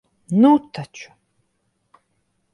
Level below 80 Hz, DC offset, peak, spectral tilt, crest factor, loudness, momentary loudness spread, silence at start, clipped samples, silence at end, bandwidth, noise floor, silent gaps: -68 dBFS; under 0.1%; -2 dBFS; -7.5 dB/octave; 20 dB; -16 LUFS; 22 LU; 0.3 s; under 0.1%; 1.5 s; 11 kHz; -70 dBFS; none